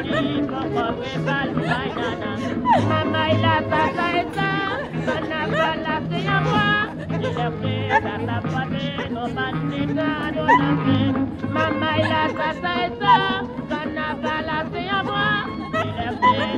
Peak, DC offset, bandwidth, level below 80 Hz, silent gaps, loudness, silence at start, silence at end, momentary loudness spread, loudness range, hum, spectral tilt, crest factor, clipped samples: -4 dBFS; under 0.1%; 11 kHz; -46 dBFS; none; -22 LUFS; 0 s; 0 s; 7 LU; 2 LU; none; -6.5 dB/octave; 18 dB; under 0.1%